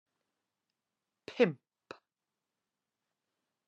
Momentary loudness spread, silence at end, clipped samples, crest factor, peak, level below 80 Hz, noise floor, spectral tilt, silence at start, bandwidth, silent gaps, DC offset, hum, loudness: 23 LU; 2.15 s; under 0.1%; 28 dB; -14 dBFS; under -90 dBFS; under -90 dBFS; -7 dB/octave; 1.3 s; 7.8 kHz; none; under 0.1%; none; -31 LUFS